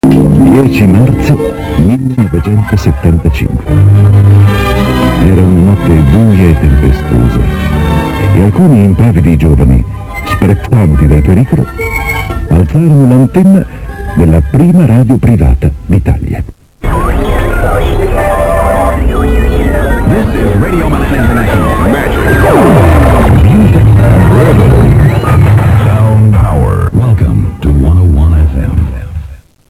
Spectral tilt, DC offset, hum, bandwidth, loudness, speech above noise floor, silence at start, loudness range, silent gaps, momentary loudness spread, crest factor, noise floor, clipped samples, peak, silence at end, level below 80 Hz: -8 dB/octave; under 0.1%; none; 16 kHz; -7 LUFS; 21 dB; 0.05 s; 4 LU; none; 7 LU; 6 dB; -26 dBFS; 2%; 0 dBFS; 0.35 s; -12 dBFS